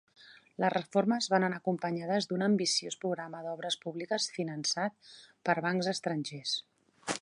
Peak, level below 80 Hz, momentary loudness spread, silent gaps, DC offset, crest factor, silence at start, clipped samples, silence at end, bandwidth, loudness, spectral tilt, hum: -12 dBFS; -82 dBFS; 9 LU; none; under 0.1%; 20 dB; 0.2 s; under 0.1%; 0.05 s; 11.5 kHz; -32 LUFS; -4 dB/octave; none